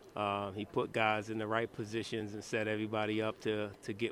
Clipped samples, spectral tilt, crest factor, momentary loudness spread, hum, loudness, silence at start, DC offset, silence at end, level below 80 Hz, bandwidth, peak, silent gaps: under 0.1%; -5.5 dB/octave; 22 dB; 7 LU; none; -36 LUFS; 0 s; under 0.1%; 0 s; -70 dBFS; 14.5 kHz; -16 dBFS; none